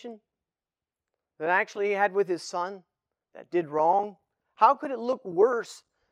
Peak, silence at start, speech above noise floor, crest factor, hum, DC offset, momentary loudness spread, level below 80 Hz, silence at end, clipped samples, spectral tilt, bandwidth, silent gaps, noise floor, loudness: -6 dBFS; 0.05 s; over 64 dB; 22 dB; none; under 0.1%; 13 LU; -86 dBFS; 0.35 s; under 0.1%; -5 dB/octave; 11 kHz; none; under -90 dBFS; -26 LUFS